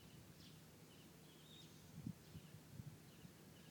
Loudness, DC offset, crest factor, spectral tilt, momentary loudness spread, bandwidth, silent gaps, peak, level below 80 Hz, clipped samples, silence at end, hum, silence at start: -60 LUFS; under 0.1%; 24 dB; -5 dB/octave; 8 LU; 19 kHz; none; -36 dBFS; -76 dBFS; under 0.1%; 0 s; none; 0 s